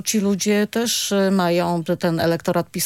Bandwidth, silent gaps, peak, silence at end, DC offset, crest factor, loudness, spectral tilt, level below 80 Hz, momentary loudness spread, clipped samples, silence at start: 17 kHz; none; -8 dBFS; 0 s; under 0.1%; 12 dB; -20 LUFS; -4.5 dB/octave; -60 dBFS; 3 LU; under 0.1%; 0.05 s